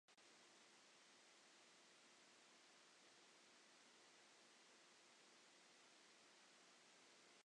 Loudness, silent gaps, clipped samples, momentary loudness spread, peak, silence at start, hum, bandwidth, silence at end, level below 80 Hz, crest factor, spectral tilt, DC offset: -69 LUFS; none; under 0.1%; 0 LU; -58 dBFS; 0.1 s; none; 10 kHz; 0 s; under -90 dBFS; 14 dB; -0.5 dB/octave; under 0.1%